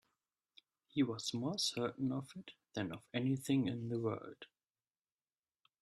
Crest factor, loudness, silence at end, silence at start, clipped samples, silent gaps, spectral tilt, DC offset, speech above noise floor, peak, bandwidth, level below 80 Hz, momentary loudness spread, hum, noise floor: 18 dB; -39 LUFS; 1.35 s; 0.95 s; under 0.1%; none; -5 dB/octave; under 0.1%; over 51 dB; -24 dBFS; 13.5 kHz; -78 dBFS; 17 LU; none; under -90 dBFS